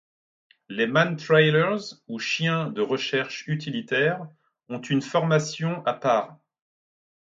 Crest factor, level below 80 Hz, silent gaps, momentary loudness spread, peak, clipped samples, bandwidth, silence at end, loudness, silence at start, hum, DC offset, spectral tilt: 20 dB; -72 dBFS; none; 15 LU; -4 dBFS; under 0.1%; 7.8 kHz; 0.95 s; -24 LUFS; 0.7 s; none; under 0.1%; -5.5 dB/octave